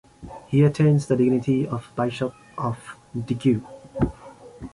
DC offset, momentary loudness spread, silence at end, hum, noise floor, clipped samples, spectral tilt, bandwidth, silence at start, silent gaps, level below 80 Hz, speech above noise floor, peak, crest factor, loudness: under 0.1%; 17 LU; 0.05 s; none; -45 dBFS; under 0.1%; -8 dB/octave; 11.5 kHz; 0.2 s; none; -46 dBFS; 22 dB; -8 dBFS; 16 dB; -23 LUFS